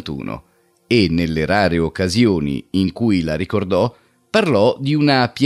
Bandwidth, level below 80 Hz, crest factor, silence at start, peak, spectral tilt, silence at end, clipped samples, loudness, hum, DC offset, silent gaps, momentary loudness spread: 13 kHz; -42 dBFS; 14 dB; 0.05 s; -2 dBFS; -6.5 dB/octave; 0 s; under 0.1%; -17 LUFS; none; under 0.1%; none; 6 LU